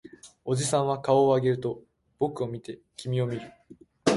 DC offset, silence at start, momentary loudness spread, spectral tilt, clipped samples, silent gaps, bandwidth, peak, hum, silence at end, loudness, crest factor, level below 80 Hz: under 0.1%; 0.25 s; 18 LU; -5.5 dB/octave; under 0.1%; none; 11.5 kHz; -8 dBFS; none; 0 s; -27 LUFS; 20 dB; -62 dBFS